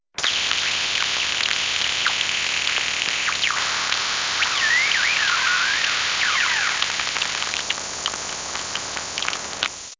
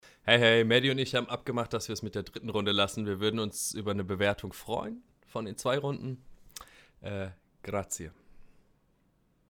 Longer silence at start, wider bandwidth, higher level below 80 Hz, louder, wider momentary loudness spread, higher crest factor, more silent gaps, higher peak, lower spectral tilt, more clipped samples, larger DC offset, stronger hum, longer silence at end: about the same, 0.15 s vs 0.25 s; second, 7.8 kHz vs 19 kHz; first, -54 dBFS vs -60 dBFS; first, -20 LUFS vs -30 LUFS; second, 8 LU vs 23 LU; about the same, 22 dB vs 26 dB; neither; first, 0 dBFS vs -6 dBFS; second, 1 dB/octave vs -4 dB/octave; neither; neither; neither; second, 0.05 s vs 1.05 s